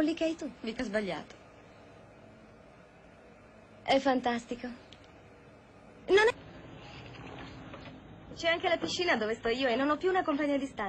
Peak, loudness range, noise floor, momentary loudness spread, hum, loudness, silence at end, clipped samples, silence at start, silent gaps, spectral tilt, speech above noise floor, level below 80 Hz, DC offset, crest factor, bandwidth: -14 dBFS; 8 LU; -56 dBFS; 21 LU; none; -30 LUFS; 0 s; under 0.1%; 0 s; none; -4 dB/octave; 25 dB; -62 dBFS; under 0.1%; 20 dB; 9 kHz